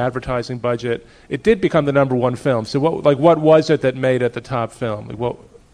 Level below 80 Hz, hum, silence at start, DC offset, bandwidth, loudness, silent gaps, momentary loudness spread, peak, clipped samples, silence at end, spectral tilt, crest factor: -46 dBFS; none; 0 s; under 0.1%; 10.5 kHz; -18 LUFS; none; 12 LU; 0 dBFS; under 0.1%; 0.35 s; -7 dB/octave; 16 dB